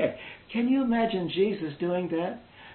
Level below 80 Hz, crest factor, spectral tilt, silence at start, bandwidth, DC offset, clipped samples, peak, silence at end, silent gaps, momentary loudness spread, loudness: -60 dBFS; 16 dB; -10.5 dB/octave; 0 s; 4.4 kHz; under 0.1%; under 0.1%; -12 dBFS; 0 s; none; 10 LU; -28 LUFS